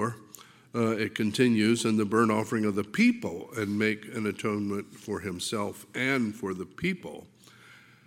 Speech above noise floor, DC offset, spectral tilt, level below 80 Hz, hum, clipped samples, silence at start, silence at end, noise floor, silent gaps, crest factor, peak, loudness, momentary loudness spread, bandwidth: 26 dB; under 0.1%; -5 dB/octave; -68 dBFS; none; under 0.1%; 0 s; 0.3 s; -54 dBFS; none; 18 dB; -10 dBFS; -28 LUFS; 12 LU; 16 kHz